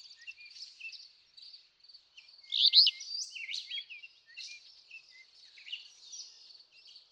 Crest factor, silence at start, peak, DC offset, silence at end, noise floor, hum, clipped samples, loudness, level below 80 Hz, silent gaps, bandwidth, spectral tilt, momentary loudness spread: 26 dB; 0.05 s; -10 dBFS; under 0.1%; 0.8 s; -60 dBFS; none; under 0.1%; -27 LUFS; under -90 dBFS; none; 15.5 kHz; 6 dB/octave; 29 LU